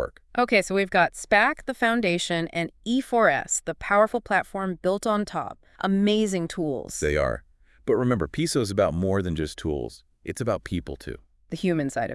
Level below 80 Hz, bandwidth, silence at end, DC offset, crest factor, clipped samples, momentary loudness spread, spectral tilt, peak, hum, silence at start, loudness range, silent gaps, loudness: -46 dBFS; 12 kHz; 0 s; under 0.1%; 20 dB; under 0.1%; 12 LU; -4.5 dB/octave; -6 dBFS; none; 0 s; 4 LU; none; -25 LUFS